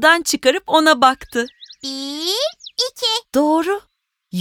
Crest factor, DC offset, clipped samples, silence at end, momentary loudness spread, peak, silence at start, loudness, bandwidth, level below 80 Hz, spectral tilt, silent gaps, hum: 18 dB; under 0.1%; under 0.1%; 0 s; 13 LU; 0 dBFS; 0 s; -17 LUFS; 18.5 kHz; -54 dBFS; -2.5 dB/octave; none; none